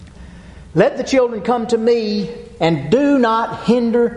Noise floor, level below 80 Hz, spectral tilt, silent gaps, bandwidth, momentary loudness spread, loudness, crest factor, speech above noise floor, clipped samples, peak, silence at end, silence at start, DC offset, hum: -37 dBFS; -44 dBFS; -6.5 dB/octave; none; 10.5 kHz; 7 LU; -16 LUFS; 16 dB; 22 dB; under 0.1%; -2 dBFS; 0 s; 0 s; under 0.1%; none